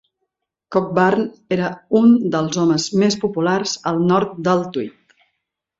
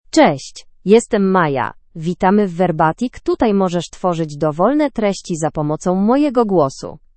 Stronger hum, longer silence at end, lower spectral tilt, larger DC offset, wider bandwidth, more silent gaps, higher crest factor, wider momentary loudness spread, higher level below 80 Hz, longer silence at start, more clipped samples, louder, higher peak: neither; first, 0.9 s vs 0.2 s; about the same, -5.5 dB/octave vs -6 dB/octave; neither; second, 7.8 kHz vs 8.8 kHz; neither; about the same, 16 dB vs 16 dB; about the same, 8 LU vs 9 LU; second, -60 dBFS vs -44 dBFS; first, 0.7 s vs 0.15 s; neither; about the same, -18 LUFS vs -16 LUFS; about the same, -2 dBFS vs 0 dBFS